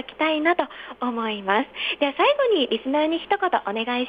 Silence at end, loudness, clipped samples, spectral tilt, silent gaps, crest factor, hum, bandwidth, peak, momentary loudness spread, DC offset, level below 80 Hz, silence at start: 0 s; -23 LUFS; under 0.1%; -6 dB/octave; none; 16 dB; none; 5 kHz; -6 dBFS; 7 LU; under 0.1%; -64 dBFS; 0 s